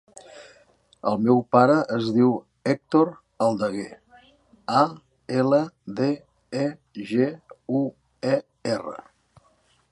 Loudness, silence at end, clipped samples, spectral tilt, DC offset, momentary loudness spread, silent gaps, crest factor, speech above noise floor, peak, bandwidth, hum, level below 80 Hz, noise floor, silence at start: -24 LUFS; 0.95 s; under 0.1%; -7 dB/octave; under 0.1%; 15 LU; none; 20 dB; 41 dB; -4 dBFS; 11 kHz; none; -66 dBFS; -63 dBFS; 0.35 s